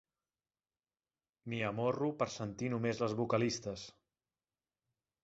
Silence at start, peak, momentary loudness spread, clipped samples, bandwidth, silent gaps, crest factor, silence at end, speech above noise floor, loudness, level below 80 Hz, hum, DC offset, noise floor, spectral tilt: 1.45 s; -18 dBFS; 12 LU; under 0.1%; 8 kHz; none; 22 dB; 1.35 s; over 54 dB; -37 LUFS; -70 dBFS; none; under 0.1%; under -90 dBFS; -5.5 dB/octave